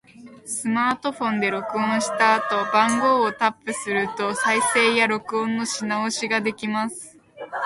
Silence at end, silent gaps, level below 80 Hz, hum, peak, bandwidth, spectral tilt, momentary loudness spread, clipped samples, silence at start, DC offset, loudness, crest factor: 0 s; none; -68 dBFS; none; -4 dBFS; 11.5 kHz; -3 dB/octave; 10 LU; under 0.1%; 0.2 s; under 0.1%; -22 LUFS; 18 dB